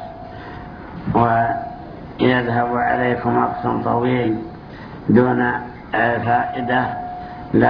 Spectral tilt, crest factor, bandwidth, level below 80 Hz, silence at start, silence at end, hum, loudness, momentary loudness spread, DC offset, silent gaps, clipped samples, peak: -10 dB/octave; 18 dB; 5.4 kHz; -44 dBFS; 0 s; 0 s; none; -19 LUFS; 18 LU; under 0.1%; none; under 0.1%; 0 dBFS